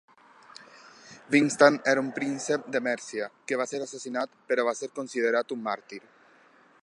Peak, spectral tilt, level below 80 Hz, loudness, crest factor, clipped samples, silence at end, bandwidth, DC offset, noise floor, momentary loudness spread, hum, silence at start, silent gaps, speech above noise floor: -4 dBFS; -4 dB/octave; -84 dBFS; -27 LUFS; 24 dB; under 0.1%; 0.85 s; 11 kHz; under 0.1%; -59 dBFS; 15 LU; none; 0.6 s; none; 32 dB